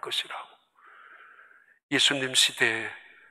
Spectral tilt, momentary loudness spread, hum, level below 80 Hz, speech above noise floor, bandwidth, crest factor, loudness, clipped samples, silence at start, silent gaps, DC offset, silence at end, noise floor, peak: -1 dB/octave; 17 LU; none; -82 dBFS; 30 dB; 16 kHz; 24 dB; -24 LUFS; under 0.1%; 0.05 s; 1.83-1.89 s; under 0.1%; 0.3 s; -56 dBFS; -6 dBFS